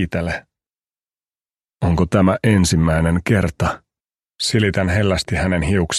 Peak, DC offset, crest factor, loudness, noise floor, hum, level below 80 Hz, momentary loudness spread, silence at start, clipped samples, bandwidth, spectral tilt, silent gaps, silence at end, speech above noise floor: 0 dBFS; under 0.1%; 18 dB; -18 LUFS; under -90 dBFS; none; -34 dBFS; 8 LU; 0 s; under 0.1%; 13.5 kHz; -5.5 dB/octave; none; 0 s; over 73 dB